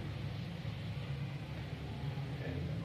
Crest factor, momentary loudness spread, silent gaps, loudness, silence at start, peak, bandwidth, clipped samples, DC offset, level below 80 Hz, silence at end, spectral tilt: 12 dB; 3 LU; none; -42 LUFS; 0 s; -28 dBFS; 14 kHz; under 0.1%; under 0.1%; -54 dBFS; 0 s; -7.5 dB/octave